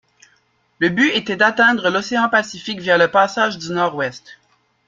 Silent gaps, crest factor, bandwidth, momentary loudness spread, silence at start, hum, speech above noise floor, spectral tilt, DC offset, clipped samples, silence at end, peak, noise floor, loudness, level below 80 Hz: none; 18 dB; 7.6 kHz; 9 LU; 0.8 s; none; 44 dB; -4 dB/octave; under 0.1%; under 0.1%; 0.55 s; 0 dBFS; -61 dBFS; -17 LUFS; -62 dBFS